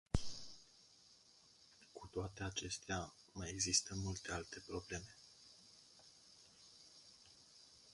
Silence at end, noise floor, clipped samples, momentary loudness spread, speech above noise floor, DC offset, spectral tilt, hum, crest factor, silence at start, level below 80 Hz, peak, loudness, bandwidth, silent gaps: 0 s; -68 dBFS; under 0.1%; 24 LU; 24 dB; under 0.1%; -3 dB/octave; none; 28 dB; 0.15 s; -58 dBFS; -20 dBFS; -43 LUFS; 11.5 kHz; none